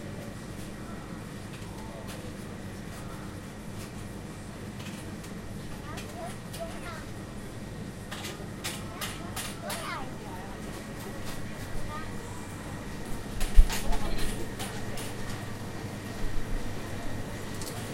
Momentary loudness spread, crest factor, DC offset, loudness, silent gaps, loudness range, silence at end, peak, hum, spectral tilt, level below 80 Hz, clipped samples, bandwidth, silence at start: 6 LU; 26 dB; under 0.1%; -37 LUFS; none; 7 LU; 0 s; -4 dBFS; none; -4.5 dB/octave; -36 dBFS; under 0.1%; 16 kHz; 0 s